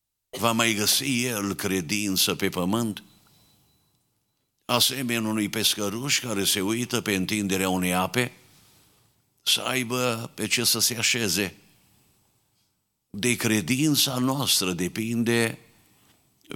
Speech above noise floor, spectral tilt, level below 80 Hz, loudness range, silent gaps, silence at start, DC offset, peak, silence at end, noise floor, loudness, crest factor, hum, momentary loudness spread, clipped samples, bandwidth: 49 dB; -3 dB/octave; -64 dBFS; 3 LU; none; 0.35 s; under 0.1%; -4 dBFS; 0 s; -74 dBFS; -24 LUFS; 22 dB; none; 7 LU; under 0.1%; 18.5 kHz